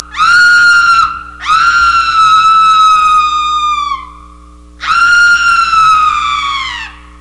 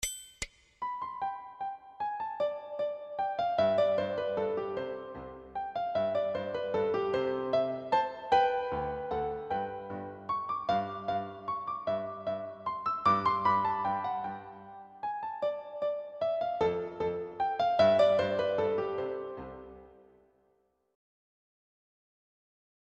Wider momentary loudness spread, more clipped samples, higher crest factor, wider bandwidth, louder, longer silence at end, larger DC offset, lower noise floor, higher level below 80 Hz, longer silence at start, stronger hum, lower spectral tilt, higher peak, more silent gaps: about the same, 13 LU vs 14 LU; neither; second, 8 dB vs 20 dB; about the same, 11.5 kHz vs 11 kHz; first, -7 LUFS vs -32 LUFS; second, 0.3 s vs 2.95 s; first, 0.5% vs under 0.1%; second, -35 dBFS vs -73 dBFS; first, -36 dBFS vs -62 dBFS; about the same, 0 s vs 0 s; first, 60 Hz at -40 dBFS vs none; second, 0.5 dB/octave vs -4.5 dB/octave; first, 0 dBFS vs -14 dBFS; neither